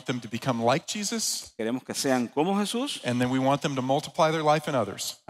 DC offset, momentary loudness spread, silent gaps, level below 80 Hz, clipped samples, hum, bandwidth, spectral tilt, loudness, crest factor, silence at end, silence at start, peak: under 0.1%; 6 LU; none; -68 dBFS; under 0.1%; none; 16 kHz; -4 dB/octave; -27 LUFS; 18 dB; 0.15 s; 0.05 s; -10 dBFS